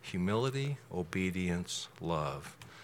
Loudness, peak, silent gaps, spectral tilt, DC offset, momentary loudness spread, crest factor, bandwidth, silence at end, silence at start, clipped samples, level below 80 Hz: -36 LUFS; -18 dBFS; none; -5.5 dB/octave; under 0.1%; 7 LU; 18 dB; 16 kHz; 0 s; 0 s; under 0.1%; -64 dBFS